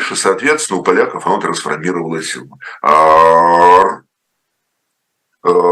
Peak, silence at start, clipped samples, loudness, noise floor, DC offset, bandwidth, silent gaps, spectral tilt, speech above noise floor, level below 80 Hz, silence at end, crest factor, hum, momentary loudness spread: 0 dBFS; 0 s; 0.3%; -12 LUFS; -71 dBFS; under 0.1%; 12.5 kHz; none; -3.5 dB/octave; 59 dB; -54 dBFS; 0 s; 12 dB; none; 14 LU